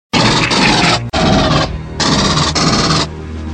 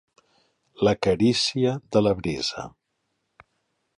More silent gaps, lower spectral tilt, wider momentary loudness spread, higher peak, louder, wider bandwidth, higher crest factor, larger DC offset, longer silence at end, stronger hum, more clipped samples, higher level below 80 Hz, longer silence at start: neither; about the same, -4 dB/octave vs -5 dB/octave; about the same, 6 LU vs 8 LU; first, 0 dBFS vs -8 dBFS; first, -12 LUFS vs -23 LUFS; second, 10 kHz vs 11.5 kHz; second, 12 dB vs 18 dB; neither; second, 0 s vs 1.3 s; neither; neither; first, -28 dBFS vs -52 dBFS; second, 0.15 s vs 0.8 s